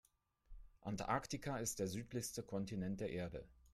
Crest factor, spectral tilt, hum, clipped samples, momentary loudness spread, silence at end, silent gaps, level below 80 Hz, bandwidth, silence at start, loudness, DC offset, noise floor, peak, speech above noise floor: 22 dB; -4.5 dB/octave; none; under 0.1%; 7 LU; 0.15 s; none; -64 dBFS; 15 kHz; 0.5 s; -44 LUFS; under 0.1%; -64 dBFS; -24 dBFS; 20 dB